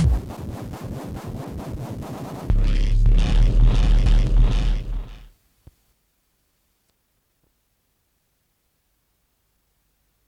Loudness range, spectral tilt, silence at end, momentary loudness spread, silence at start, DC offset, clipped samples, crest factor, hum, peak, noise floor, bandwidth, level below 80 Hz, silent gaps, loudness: 9 LU; -7 dB/octave; 5.05 s; 14 LU; 0 s; under 0.1%; under 0.1%; 16 dB; none; -6 dBFS; -69 dBFS; 7.4 kHz; -22 dBFS; none; -24 LUFS